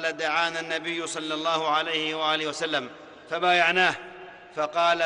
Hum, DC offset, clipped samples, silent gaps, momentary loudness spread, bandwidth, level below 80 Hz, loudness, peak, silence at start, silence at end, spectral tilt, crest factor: none; under 0.1%; under 0.1%; none; 16 LU; 11 kHz; -70 dBFS; -25 LUFS; -8 dBFS; 0 s; 0 s; -2.5 dB/octave; 18 dB